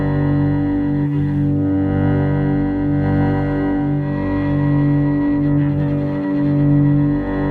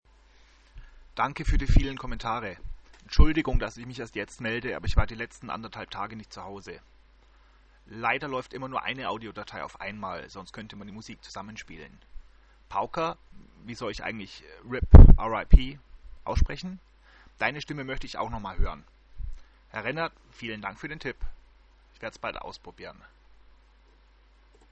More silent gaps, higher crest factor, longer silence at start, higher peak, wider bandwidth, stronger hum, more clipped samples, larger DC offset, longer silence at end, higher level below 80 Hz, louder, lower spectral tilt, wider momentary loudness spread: neither; second, 12 dB vs 24 dB; second, 0 s vs 0.75 s; second, -6 dBFS vs 0 dBFS; second, 4.4 kHz vs 8 kHz; neither; neither; neither; second, 0 s vs 1.8 s; second, -32 dBFS vs -26 dBFS; first, -17 LUFS vs -28 LUFS; first, -11 dB/octave vs -7 dB/octave; second, 4 LU vs 20 LU